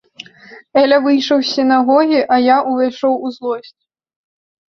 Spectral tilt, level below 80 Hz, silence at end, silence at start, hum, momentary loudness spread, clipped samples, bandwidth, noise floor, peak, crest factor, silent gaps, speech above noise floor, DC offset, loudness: -4 dB/octave; -62 dBFS; 1 s; 0.5 s; none; 11 LU; under 0.1%; 6.4 kHz; -41 dBFS; -2 dBFS; 14 dB; none; 28 dB; under 0.1%; -14 LUFS